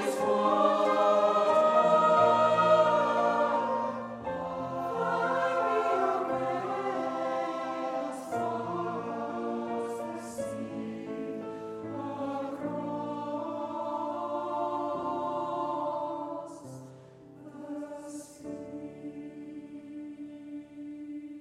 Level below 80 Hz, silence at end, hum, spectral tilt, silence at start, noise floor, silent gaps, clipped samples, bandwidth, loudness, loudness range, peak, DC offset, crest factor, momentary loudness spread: -72 dBFS; 0 s; none; -5.5 dB/octave; 0 s; -51 dBFS; none; under 0.1%; 13 kHz; -29 LUFS; 18 LU; -10 dBFS; under 0.1%; 20 dB; 20 LU